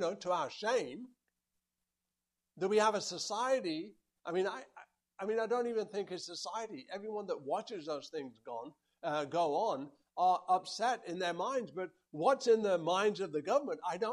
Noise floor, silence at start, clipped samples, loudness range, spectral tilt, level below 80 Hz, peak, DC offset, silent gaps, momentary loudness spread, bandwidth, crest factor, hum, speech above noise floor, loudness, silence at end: -90 dBFS; 0 s; under 0.1%; 6 LU; -4 dB/octave; -86 dBFS; -16 dBFS; under 0.1%; none; 14 LU; 12 kHz; 20 dB; none; 54 dB; -35 LUFS; 0 s